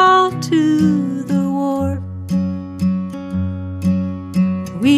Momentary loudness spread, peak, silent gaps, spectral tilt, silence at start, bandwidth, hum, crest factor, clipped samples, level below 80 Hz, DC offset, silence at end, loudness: 9 LU; -2 dBFS; none; -6.5 dB/octave; 0 s; 13 kHz; none; 14 dB; under 0.1%; -46 dBFS; under 0.1%; 0 s; -18 LUFS